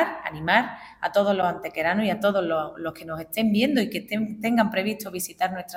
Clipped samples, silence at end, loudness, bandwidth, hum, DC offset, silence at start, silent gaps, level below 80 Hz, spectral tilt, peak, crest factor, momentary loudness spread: under 0.1%; 0 s; -25 LUFS; 17 kHz; none; under 0.1%; 0 s; none; -60 dBFS; -5 dB/octave; -6 dBFS; 20 dB; 10 LU